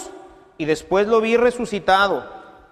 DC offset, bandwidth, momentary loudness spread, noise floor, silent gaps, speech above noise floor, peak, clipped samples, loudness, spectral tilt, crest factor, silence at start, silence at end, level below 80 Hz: under 0.1%; 13 kHz; 12 LU; -43 dBFS; none; 25 dB; -4 dBFS; under 0.1%; -19 LUFS; -4.5 dB/octave; 16 dB; 0 s; 0.25 s; -50 dBFS